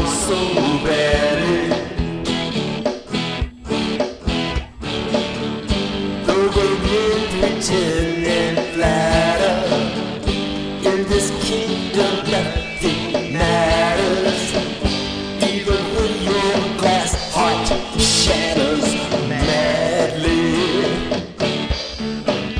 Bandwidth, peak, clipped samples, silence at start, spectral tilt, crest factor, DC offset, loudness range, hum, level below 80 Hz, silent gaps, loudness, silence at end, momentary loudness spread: 11 kHz; -4 dBFS; under 0.1%; 0 s; -4 dB/octave; 16 dB; under 0.1%; 5 LU; none; -32 dBFS; none; -19 LUFS; 0 s; 7 LU